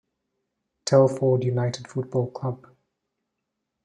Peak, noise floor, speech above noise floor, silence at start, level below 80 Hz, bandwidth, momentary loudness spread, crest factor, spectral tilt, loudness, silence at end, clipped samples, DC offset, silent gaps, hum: -4 dBFS; -81 dBFS; 59 dB; 0.85 s; -66 dBFS; 10.5 kHz; 13 LU; 22 dB; -6.5 dB/octave; -24 LUFS; 1.3 s; under 0.1%; under 0.1%; none; none